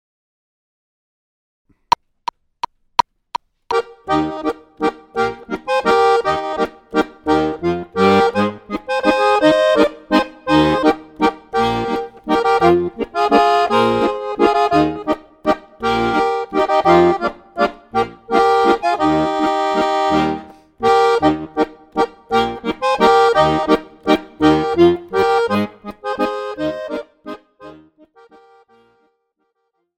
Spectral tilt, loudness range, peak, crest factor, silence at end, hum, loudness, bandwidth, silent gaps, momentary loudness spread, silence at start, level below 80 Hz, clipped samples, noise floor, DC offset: -5.5 dB/octave; 9 LU; 0 dBFS; 18 dB; 2.25 s; none; -17 LUFS; 14 kHz; none; 11 LU; 3.7 s; -46 dBFS; under 0.1%; -70 dBFS; under 0.1%